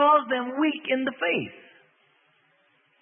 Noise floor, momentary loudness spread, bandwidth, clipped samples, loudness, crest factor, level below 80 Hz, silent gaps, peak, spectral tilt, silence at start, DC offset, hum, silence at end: -65 dBFS; 7 LU; 3.7 kHz; under 0.1%; -25 LUFS; 18 dB; -80 dBFS; none; -8 dBFS; -8.5 dB/octave; 0 s; under 0.1%; none; 1.45 s